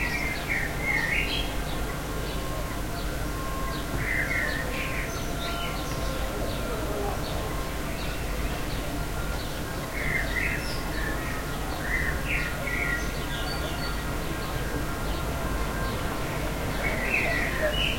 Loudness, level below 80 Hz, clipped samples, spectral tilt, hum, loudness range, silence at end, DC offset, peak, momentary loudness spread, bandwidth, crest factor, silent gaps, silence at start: -29 LUFS; -34 dBFS; under 0.1%; -4 dB/octave; none; 3 LU; 0 s; under 0.1%; -12 dBFS; 6 LU; 16.5 kHz; 16 dB; none; 0 s